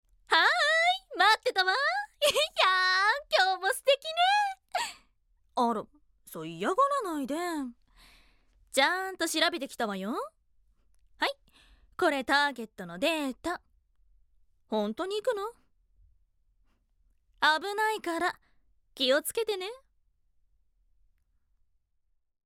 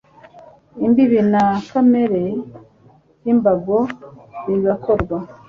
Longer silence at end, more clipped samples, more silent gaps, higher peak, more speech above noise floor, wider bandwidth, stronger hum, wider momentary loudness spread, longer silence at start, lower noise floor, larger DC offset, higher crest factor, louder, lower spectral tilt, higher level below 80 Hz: first, 2.7 s vs 0.15 s; neither; neither; second, -10 dBFS vs -2 dBFS; first, 45 dB vs 35 dB; first, 16.5 kHz vs 7 kHz; neither; about the same, 14 LU vs 15 LU; about the same, 0.3 s vs 0.35 s; first, -74 dBFS vs -51 dBFS; neither; first, 22 dB vs 16 dB; second, -28 LUFS vs -17 LUFS; second, -2 dB/octave vs -9 dB/octave; second, -68 dBFS vs -46 dBFS